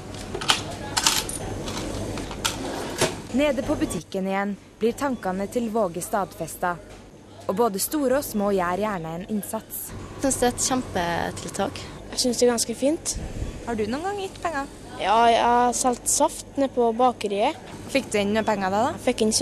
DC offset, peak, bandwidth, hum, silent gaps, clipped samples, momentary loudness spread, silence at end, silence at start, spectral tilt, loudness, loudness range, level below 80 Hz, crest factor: under 0.1%; -2 dBFS; 15 kHz; none; none; under 0.1%; 10 LU; 0 s; 0 s; -3.5 dB/octave; -24 LUFS; 5 LU; -44 dBFS; 22 dB